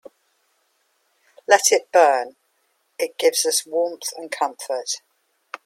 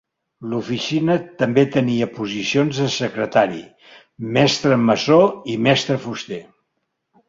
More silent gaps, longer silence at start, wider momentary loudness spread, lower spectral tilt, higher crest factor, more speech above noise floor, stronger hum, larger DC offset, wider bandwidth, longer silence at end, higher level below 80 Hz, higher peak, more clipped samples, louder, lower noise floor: neither; first, 1.5 s vs 0.4 s; about the same, 14 LU vs 13 LU; second, 1 dB/octave vs -5.5 dB/octave; about the same, 22 dB vs 18 dB; second, 48 dB vs 56 dB; neither; neither; first, 16.5 kHz vs 7.8 kHz; second, 0.7 s vs 0.85 s; second, -82 dBFS vs -58 dBFS; about the same, 0 dBFS vs -2 dBFS; neither; about the same, -20 LUFS vs -19 LUFS; second, -68 dBFS vs -74 dBFS